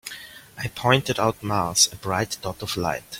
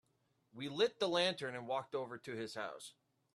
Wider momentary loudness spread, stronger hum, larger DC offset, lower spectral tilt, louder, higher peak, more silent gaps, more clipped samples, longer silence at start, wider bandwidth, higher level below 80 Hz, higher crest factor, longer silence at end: first, 16 LU vs 13 LU; neither; neither; about the same, -3 dB/octave vs -4 dB/octave; first, -23 LUFS vs -39 LUFS; first, -2 dBFS vs -20 dBFS; neither; neither; second, 0.05 s vs 0.55 s; first, 16.5 kHz vs 13 kHz; first, -52 dBFS vs -84 dBFS; about the same, 22 dB vs 20 dB; second, 0 s vs 0.45 s